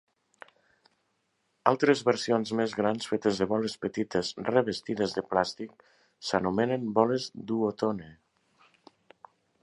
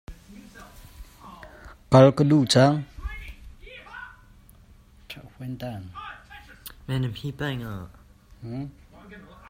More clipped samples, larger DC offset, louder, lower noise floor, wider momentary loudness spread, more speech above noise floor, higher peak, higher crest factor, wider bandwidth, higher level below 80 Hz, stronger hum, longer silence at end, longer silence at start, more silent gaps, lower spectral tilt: neither; neither; second, -29 LUFS vs -22 LUFS; first, -76 dBFS vs -52 dBFS; second, 8 LU vs 29 LU; first, 47 dB vs 31 dB; about the same, -4 dBFS vs -2 dBFS; about the same, 26 dB vs 24 dB; second, 11.5 kHz vs 16 kHz; second, -64 dBFS vs -48 dBFS; neither; first, 1.5 s vs 0.3 s; first, 1.65 s vs 0.1 s; neither; about the same, -5.5 dB/octave vs -6.5 dB/octave